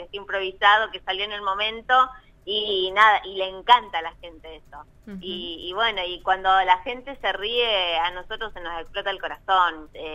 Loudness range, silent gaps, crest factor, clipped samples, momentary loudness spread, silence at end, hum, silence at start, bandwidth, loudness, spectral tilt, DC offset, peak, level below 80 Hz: 4 LU; none; 22 dB; under 0.1%; 15 LU; 0 s; none; 0 s; 12.5 kHz; -22 LUFS; -3 dB/octave; under 0.1%; -2 dBFS; -50 dBFS